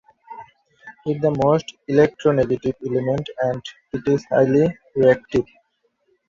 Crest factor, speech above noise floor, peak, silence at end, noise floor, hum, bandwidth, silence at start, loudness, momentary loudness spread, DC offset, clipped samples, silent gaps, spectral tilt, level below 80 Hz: 18 dB; 48 dB; -2 dBFS; 0.85 s; -68 dBFS; none; 7.4 kHz; 0.3 s; -20 LUFS; 14 LU; under 0.1%; under 0.1%; none; -7.5 dB/octave; -52 dBFS